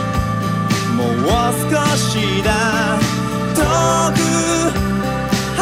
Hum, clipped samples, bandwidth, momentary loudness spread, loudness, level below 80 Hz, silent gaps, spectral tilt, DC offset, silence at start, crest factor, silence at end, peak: none; under 0.1%; 16 kHz; 4 LU; -16 LUFS; -32 dBFS; none; -4.5 dB/octave; under 0.1%; 0 s; 12 dB; 0 s; -4 dBFS